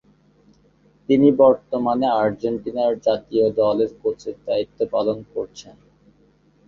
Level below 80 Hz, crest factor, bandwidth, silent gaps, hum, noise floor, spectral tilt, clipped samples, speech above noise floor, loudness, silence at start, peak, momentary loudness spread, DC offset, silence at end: -58 dBFS; 18 dB; 7.2 kHz; none; none; -57 dBFS; -7.5 dB/octave; under 0.1%; 38 dB; -20 LUFS; 1.1 s; -2 dBFS; 15 LU; under 0.1%; 1 s